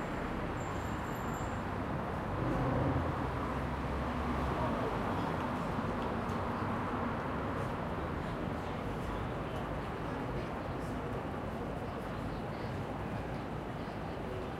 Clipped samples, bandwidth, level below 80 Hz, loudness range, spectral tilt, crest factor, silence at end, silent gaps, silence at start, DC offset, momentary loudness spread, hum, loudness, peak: under 0.1%; 16 kHz; -48 dBFS; 4 LU; -7 dB/octave; 16 dB; 0 s; none; 0 s; under 0.1%; 5 LU; none; -37 LUFS; -20 dBFS